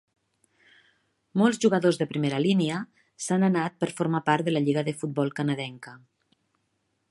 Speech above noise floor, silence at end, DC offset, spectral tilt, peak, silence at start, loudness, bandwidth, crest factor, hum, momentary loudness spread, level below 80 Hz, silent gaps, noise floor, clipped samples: 50 dB; 1.15 s; under 0.1%; -6 dB/octave; -6 dBFS; 1.35 s; -26 LUFS; 11.5 kHz; 20 dB; none; 13 LU; -72 dBFS; none; -75 dBFS; under 0.1%